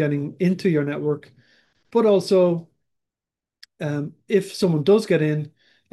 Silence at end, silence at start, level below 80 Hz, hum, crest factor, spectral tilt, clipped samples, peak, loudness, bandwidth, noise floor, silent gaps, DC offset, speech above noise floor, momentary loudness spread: 0.45 s; 0 s; -70 dBFS; none; 16 dB; -7 dB/octave; under 0.1%; -6 dBFS; -21 LUFS; 12.5 kHz; -89 dBFS; none; under 0.1%; 69 dB; 12 LU